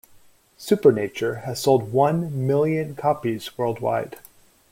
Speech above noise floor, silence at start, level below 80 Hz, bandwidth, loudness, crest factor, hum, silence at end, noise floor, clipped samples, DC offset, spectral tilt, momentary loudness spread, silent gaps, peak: 31 dB; 0.6 s; -60 dBFS; 16.5 kHz; -22 LUFS; 20 dB; none; 0.5 s; -53 dBFS; under 0.1%; under 0.1%; -6.5 dB/octave; 9 LU; none; -4 dBFS